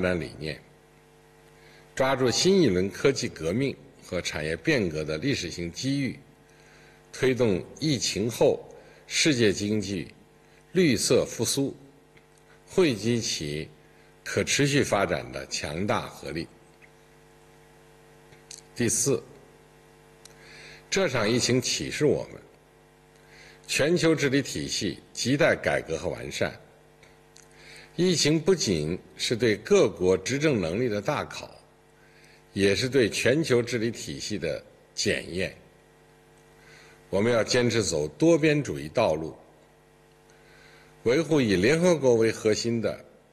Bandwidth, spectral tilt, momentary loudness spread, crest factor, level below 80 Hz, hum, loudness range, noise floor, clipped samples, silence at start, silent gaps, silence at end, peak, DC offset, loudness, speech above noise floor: 13 kHz; -4.5 dB/octave; 13 LU; 18 dB; -56 dBFS; none; 6 LU; -57 dBFS; under 0.1%; 0 s; none; 0.3 s; -10 dBFS; under 0.1%; -26 LUFS; 32 dB